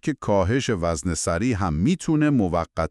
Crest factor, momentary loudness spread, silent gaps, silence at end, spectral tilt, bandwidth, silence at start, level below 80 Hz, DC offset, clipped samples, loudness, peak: 14 dB; 4 LU; none; 0 s; -6 dB/octave; 12.5 kHz; 0.05 s; -40 dBFS; under 0.1%; under 0.1%; -22 LUFS; -8 dBFS